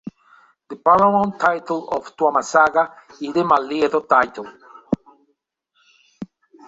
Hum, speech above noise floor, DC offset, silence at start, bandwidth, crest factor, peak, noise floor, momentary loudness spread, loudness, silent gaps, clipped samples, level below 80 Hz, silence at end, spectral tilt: none; 52 dB; under 0.1%; 0.05 s; 8 kHz; 18 dB; -2 dBFS; -70 dBFS; 23 LU; -19 LUFS; none; under 0.1%; -58 dBFS; 0.45 s; -5.5 dB/octave